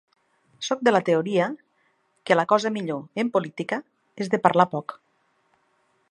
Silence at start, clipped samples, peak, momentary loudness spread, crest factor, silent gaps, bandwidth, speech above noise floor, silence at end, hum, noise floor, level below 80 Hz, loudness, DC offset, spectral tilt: 0.6 s; under 0.1%; -2 dBFS; 14 LU; 24 dB; none; 11 kHz; 45 dB; 1.15 s; none; -68 dBFS; -74 dBFS; -24 LUFS; under 0.1%; -5.5 dB/octave